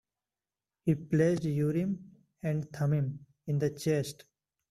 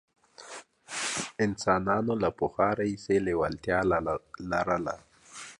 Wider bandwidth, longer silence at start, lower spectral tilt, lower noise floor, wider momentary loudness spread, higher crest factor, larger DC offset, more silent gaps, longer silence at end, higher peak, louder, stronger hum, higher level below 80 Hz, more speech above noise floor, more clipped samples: first, 13.5 kHz vs 11.5 kHz; first, 0.85 s vs 0.4 s; first, -7.5 dB/octave vs -5 dB/octave; first, under -90 dBFS vs -48 dBFS; second, 12 LU vs 18 LU; about the same, 18 dB vs 20 dB; neither; neither; first, 0.6 s vs 0.05 s; second, -14 dBFS vs -10 dBFS; second, -32 LUFS vs -29 LUFS; neither; second, -66 dBFS vs -54 dBFS; first, over 60 dB vs 20 dB; neither